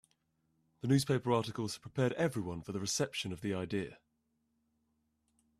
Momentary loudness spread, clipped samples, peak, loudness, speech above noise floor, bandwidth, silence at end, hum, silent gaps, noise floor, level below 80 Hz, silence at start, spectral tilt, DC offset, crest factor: 9 LU; under 0.1%; -16 dBFS; -35 LUFS; 45 dB; 14.5 kHz; 1.65 s; none; none; -80 dBFS; -68 dBFS; 0.85 s; -5 dB/octave; under 0.1%; 20 dB